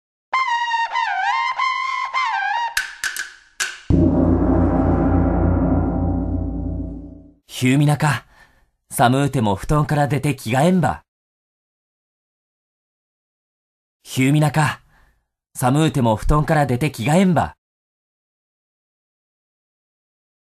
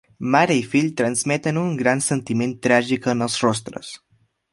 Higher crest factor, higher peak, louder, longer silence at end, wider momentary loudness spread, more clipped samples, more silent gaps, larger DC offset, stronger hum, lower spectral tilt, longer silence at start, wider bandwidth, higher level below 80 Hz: about the same, 20 dB vs 20 dB; about the same, 0 dBFS vs -2 dBFS; about the same, -19 LUFS vs -20 LUFS; first, 3 s vs 0.55 s; about the same, 10 LU vs 10 LU; neither; first, 11.08-14.00 s vs none; neither; neither; first, -6 dB/octave vs -4.5 dB/octave; about the same, 0.3 s vs 0.2 s; first, 14 kHz vs 11.5 kHz; first, -32 dBFS vs -60 dBFS